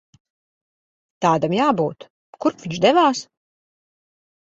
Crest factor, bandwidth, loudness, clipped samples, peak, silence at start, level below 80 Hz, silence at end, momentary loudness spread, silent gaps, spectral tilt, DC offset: 20 dB; 8.2 kHz; -19 LUFS; under 0.1%; -2 dBFS; 1.2 s; -64 dBFS; 1.25 s; 9 LU; 2.10-2.33 s; -5.5 dB/octave; under 0.1%